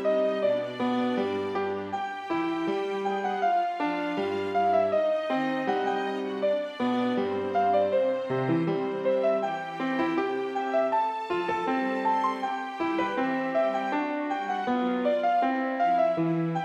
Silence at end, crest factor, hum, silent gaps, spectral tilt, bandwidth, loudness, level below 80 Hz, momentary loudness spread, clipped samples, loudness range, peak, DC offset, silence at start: 0 s; 14 dB; none; none; -7 dB/octave; 9.4 kHz; -27 LUFS; -74 dBFS; 5 LU; under 0.1%; 2 LU; -14 dBFS; under 0.1%; 0 s